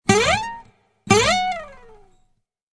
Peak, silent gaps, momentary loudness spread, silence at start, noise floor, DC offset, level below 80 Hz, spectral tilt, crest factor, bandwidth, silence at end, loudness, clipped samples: 0 dBFS; none; 16 LU; 0.05 s; -65 dBFS; under 0.1%; -44 dBFS; -3.5 dB/octave; 22 dB; 11 kHz; 1.05 s; -18 LUFS; under 0.1%